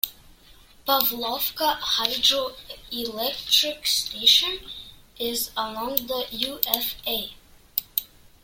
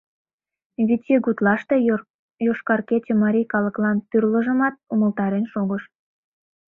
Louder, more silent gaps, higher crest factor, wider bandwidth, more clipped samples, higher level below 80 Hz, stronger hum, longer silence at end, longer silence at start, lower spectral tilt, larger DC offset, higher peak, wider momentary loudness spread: about the same, -23 LUFS vs -21 LUFS; second, none vs 2.10-2.29 s; first, 26 dB vs 18 dB; first, 17 kHz vs 3.9 kHz; neither; first, -54 dBFS vs -64 dBFS; neither; second, 0.4 s vs 0.85 s; second, 0.05 s vs 0.8 s; second, -0.5 dB/octave vs -10.5 dB/octave; neither; first, 0 dBFS vs -4 dBFS; first, 14 LU vs 6 LU